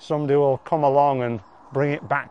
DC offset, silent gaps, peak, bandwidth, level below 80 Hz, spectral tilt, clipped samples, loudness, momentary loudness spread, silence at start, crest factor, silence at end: 0.1%; none; -6 dBFS; 8 kHz; -64 dBFS; -8.5 dB/octave; under 0.1%; -21 LUFS; 10 LU; 0.05 s; 16 dB; 0 s